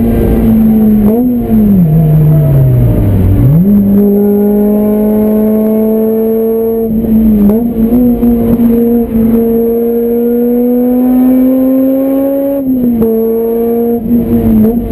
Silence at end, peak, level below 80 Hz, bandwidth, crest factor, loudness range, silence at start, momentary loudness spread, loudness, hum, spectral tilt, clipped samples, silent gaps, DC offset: 0 s; 0 dBFS; -22 dBFS; 13.5 kHz; 8 dB; 2 LU; 0 s; 4 LU; -8 LUFS; none; -10.5 dB/octave; 0.1%; none; under 0.1%